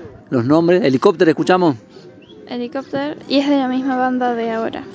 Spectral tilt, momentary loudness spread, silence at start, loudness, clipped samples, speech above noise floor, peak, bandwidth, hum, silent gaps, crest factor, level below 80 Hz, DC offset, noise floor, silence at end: -7 dB/octave; 12 LU; 0 s; -17 LUFS; under 0.1%; 24 dB; 0 dBFS; 8 kHz; none; none; 16 dB; -58 dBFS; under 0.1%; -40 dBFS; 0 s